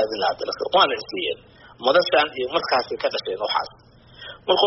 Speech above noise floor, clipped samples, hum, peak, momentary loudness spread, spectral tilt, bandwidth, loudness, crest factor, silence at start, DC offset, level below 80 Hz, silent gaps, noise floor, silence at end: 20 dB; under 0.1%; none; -4 dBFS; 15 LU; 0 dB/octave; 6 kHz; -22 LUFS; 20 dB; 0 s; under 0.1%; -60 dBFS; none; -43 dBFS; 0 s